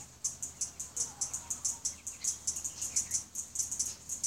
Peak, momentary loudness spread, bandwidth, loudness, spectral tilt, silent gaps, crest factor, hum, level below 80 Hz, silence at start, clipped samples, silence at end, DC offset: -16 dBFS; 5 LU; 16.5 kHz; -35 LUFS; 0.5 dB/octave; none; 22 dB; none; -62 dBFS; 0 s; under 0.1%; 0 s; under 0.1%